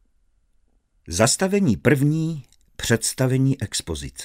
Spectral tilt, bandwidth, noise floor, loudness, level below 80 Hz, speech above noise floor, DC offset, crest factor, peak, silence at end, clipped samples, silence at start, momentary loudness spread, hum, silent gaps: -5 dB/octave; 16 kHz; -63 dBFS; -21 LUFS; -46 dBFS; 42 dB; under 0.1%; 20 dB; -2 dBFS; 0 s; under 0.1%; 1.05 s; 11 LU; none; none